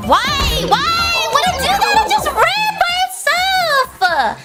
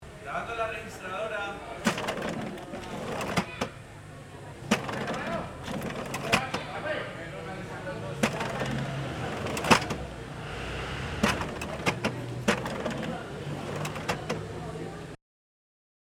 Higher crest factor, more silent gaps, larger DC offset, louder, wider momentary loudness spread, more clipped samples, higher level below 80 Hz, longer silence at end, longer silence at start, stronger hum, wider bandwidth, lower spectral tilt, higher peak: second, 14 dB vs 30 dB; neither; neither; first, -14 LUFS vs -32 LUFS; second, 3 LU vs 11 LU; neither; first, -32 dBFS vs -50 dBFS; second, 0 s vs 0.9 s; about the same, 0 s vs 0 s; neither; about the same, 17 kHz vs 17.5 kHz; second, -2.5 dB/octave vs -4.5 dB/octave; first, 0 dBFS vs -4 dBFS